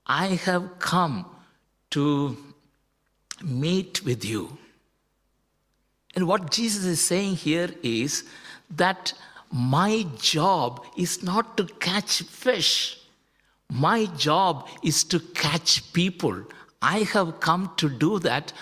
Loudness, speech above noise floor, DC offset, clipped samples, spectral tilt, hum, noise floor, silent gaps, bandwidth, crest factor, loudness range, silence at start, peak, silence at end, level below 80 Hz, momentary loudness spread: -24 LUFS; 46 dB; under 0.1%; under 0.1%; -4 dB/octave; none; -71 dBFS; none; 16 kHz; 20 dB; 6 LU; 0.1 s; -6 dBFS; 0 s; -62 dBFS; 11 LU